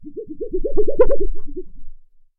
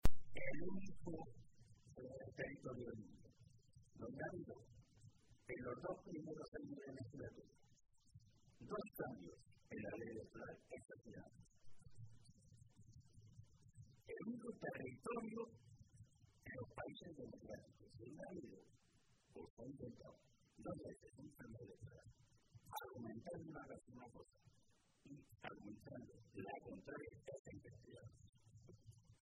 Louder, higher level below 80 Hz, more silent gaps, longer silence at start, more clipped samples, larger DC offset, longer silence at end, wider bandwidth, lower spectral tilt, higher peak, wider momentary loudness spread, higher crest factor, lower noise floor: first, -22 LUFS vs -54 LUFS; first, -26 dBFS vs -60 dBFS; second, none vs 6.48-6.52 s, 19.50-19.57 s, 27.39-27.45 s, 28.29-28.33 s; about the same, 0 s vs 0.05 s; neither; neither; first, 0.4 s vs 0.1 s; second, 2.6 kHz vs 11 kHz; first, -11.5 dB/octave vs -6.5 dB/octave; first, -2 dBFS vs -20 dBFS; about the same, 18 LU vs 18 LU; second, 12 dB vs 28 dB; second, -36 dBFS vs -78 dBFS